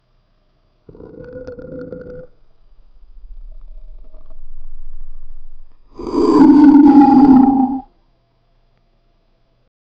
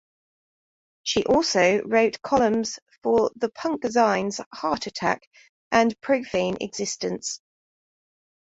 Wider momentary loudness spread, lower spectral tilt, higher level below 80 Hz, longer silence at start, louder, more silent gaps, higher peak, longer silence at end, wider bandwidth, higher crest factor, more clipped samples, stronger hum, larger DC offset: first, 26 LU vs 10 LU; first, -8.5 dB/octave vs -3.5 dB/octave; first, -34 dBFS vs -58 dBFS; about the same, 1.05 s vs 1.05 s; first, -9 LUFS vs -24 LUFS; second, none vs 2.82-2.86 s, 2.98-3.02 s, 4.46-4.51 s, 5.27-5.31 s, 5.49-5.71 s; first, 0 dBFS vs -6 dBFS; first, 2.2 s vs 1.1 s; second, 5.4 kHz vs 8 kHz; second, 14 dB vs 20 dB; neither; neither; neither